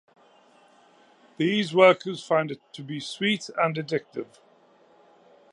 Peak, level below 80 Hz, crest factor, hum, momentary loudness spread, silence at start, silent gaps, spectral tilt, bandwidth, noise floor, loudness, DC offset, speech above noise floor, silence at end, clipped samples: -4 dBFS; -80 dBFS; 22 dB; none; 20 LU; 1.4 s; none; -5 dB/octave; 11 kHz; -58 dBFS; -24 LUFS; under 0.1%; 34 dB; 1.3 s; under 0.1%